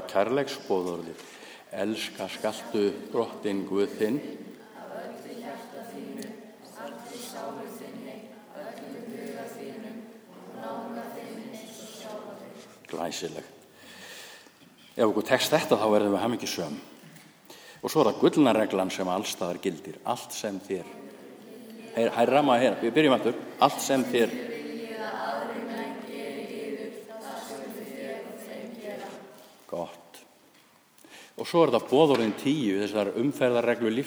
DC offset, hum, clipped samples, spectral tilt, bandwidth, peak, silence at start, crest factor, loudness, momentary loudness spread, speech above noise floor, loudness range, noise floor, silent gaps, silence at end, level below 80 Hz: under 0.1%; none; under 0.1%; -4.5 dB/octave; over 20 kHz; -6 dBFS; 0 s; 24 dB; -28 LUFS; 22 LU; 33 dB; 15 LU; -59 dBFS; none; 0 s; -76 dBFS